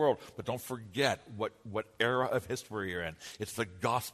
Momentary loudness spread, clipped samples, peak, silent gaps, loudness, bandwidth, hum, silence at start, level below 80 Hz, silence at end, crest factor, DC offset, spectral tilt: 9 LU; under 0.1%; -12 dBFS; none; -35 LUFS; 13.5 kHz; none; 0 s; -66 dBFS; 0 s; 22 dB; under 0.1%; -4.5 dB/octave